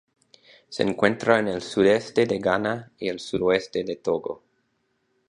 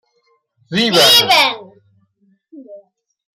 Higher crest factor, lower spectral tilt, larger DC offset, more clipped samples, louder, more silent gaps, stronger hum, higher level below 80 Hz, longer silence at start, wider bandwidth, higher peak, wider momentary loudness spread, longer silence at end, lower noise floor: first, 22 dB vs 16 dB; first, -5.5 dB/octave vs -2 dB/octave; neither; neither; second, -24 LUFS vs -10 LUFS; neither; neither; about the same, -58 dBFS vs -60 dBFS; about the same, 0.7 s vs 0.7 s; second, 10.5 kHz vs 16 kHz; about the same, -2 dBFS vs -2 dBFS; second, 10 LU vs 14 LU; first, 0.95 s vs 0.55 s; first, -72 dBFS vs -62 dBFS